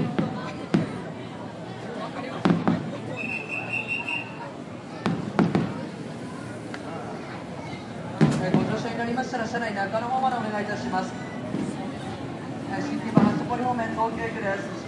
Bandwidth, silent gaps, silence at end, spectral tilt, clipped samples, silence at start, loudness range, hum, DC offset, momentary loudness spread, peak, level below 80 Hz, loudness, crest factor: 11.5 kHz; none; 0 s; -6.5 dB/octave; under 0.1%; 0 s; 3 LU; none; under 0.1%; 12 LU; -2 dBFS; -60 dBFS; -28 LUFS; 24 dB